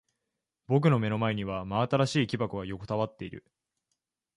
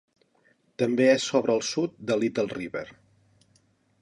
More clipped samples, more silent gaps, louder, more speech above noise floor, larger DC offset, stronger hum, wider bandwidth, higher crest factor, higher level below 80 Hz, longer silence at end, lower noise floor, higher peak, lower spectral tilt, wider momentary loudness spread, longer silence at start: neither; neither; second, -29 LUFS vs -26 LUFS; first, 57 dB vs 41 dB; neither; neither; about the same, 11 kHz vs 11.5 kHz; about the same, 20 dB vs 20 dB; first, -58 dBFS vs -68 dBFS; about the same, 1 s vs 1.1 s; first, -85 dBFS vs -66 dBFS; second, -12 dBFS vs -8 dBFS; first, -7 dB/octave vs -4.5 dB/octave; about the same, 13 LU vs 15 LU; about the same, 0.7 s vs 0.8 s